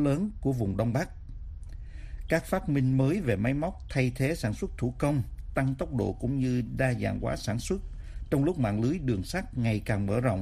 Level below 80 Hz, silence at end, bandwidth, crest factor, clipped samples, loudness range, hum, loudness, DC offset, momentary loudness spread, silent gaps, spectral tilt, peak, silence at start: -42 dBFS; 0 s; 15 kHz; 18 dB; under 0.1%; 1 LU; none; -29 LUFS; under 0.1%; 16 LU; none; -7 dB/octave; -12 dBFS; 0 s